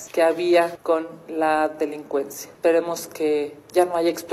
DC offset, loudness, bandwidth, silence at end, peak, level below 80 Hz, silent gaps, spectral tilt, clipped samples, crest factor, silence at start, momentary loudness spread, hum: under 0.1%; -22 LUFS; 15 kHz; 0 s; -4 dBFS; -68 dBFS; none; -4 dB/octave; under 0.1%; 18 dB; 0 s; 8 LU; none